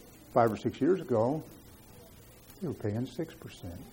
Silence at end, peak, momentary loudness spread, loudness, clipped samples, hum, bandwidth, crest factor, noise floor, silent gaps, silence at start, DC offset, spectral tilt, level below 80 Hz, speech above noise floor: 0 s; -12 dBFS; 25 LU; -31 LUFS; under 0.1%; none; 17 kHz; 20 dB; -54 dBFS; none; 0 s; under 0.1%; -7.5 dB/octave; -60 dBFS; 23 dB